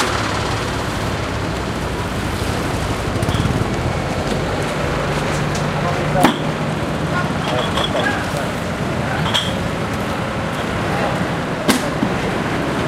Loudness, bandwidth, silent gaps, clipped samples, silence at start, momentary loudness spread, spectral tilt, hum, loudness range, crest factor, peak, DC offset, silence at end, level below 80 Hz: -19 LUFS; 16 kHz; none; under 0.1%; 0 s; 4 LU; -5 dB/octave; none; 2 LU; 20 dB; 0 dBFS; under 0.1%; 0 s; -32 dBFS